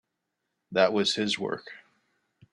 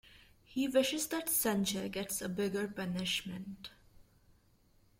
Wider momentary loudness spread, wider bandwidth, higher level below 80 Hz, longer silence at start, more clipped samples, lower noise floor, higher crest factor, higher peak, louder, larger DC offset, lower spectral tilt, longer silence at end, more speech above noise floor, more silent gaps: about the same, 14 LU vs 14 LU; second, 11.5 kHz vs 16.5 kHz; second, -72 dBFS vs -66 dBFS; first, 0.7 s vs 0.15 s; neither; first, -82 dBFS vs -68 dBFS; about the same, 24 dB vs 20 dB; first, -6 dBFS vs -16 dBFS; first, -26 LUFS vs -35 LUFS; neither; about the same, -3.5 dB/octave vs -3.5 dB/octave; second, 0.75 s vs 1 s; first, 55 dB vs 33 dB; neither